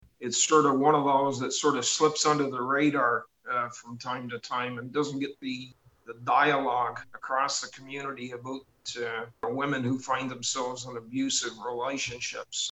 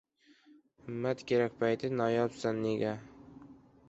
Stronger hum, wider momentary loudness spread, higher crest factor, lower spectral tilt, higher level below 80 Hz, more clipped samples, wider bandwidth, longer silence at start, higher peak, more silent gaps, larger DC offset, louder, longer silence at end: neither; second, 14 LU vs 22 LU; about the same, 20 dB vs 18 dB; second, -3 dB/octave vs -6.5 dB/octave; about the same, -70 dBFS vs -70 dBFS; neither; about the same, 8.8 kHz vs 8 kHz; second, 0.2 s vs 0.85 s; first, -10 dBFS vs -16 dBFS; neither; neither; first, -28 LUFS vs -33 LUFS; second, 0 s vs 0.35 s